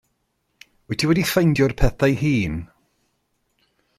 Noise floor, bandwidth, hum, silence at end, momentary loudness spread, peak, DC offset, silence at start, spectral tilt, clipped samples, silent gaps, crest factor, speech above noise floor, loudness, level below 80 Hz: -71 dBFS; 16 kHz; none; 1.35 s; 10 LU; -4 dBFS; under 0.1%; 0.9 s; -6 dB/octave; under 0.1%; none; 18 dB; 52 dB; -20 LUFS; -32 dBFS